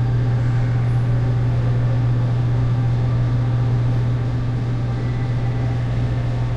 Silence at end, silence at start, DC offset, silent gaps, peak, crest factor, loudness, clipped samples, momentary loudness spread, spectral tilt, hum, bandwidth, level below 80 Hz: 0 s; 0 s; under 0.1%; none; -10 dBFS; 8 dB; -20 LUFS; under 0.1%; 3 LU; -9 dB/octave; none; 5.6 kHz; -30 dBFS